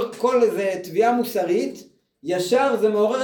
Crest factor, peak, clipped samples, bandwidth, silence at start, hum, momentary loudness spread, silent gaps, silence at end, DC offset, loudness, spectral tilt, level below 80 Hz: 14 dB; -6 dBFS; under 0.1%; over 20 kHz; 0 s; none; 7 LU; none; 0 s; under 0.1%; -21 LUFS; -5 dB/octave; -72 dBFS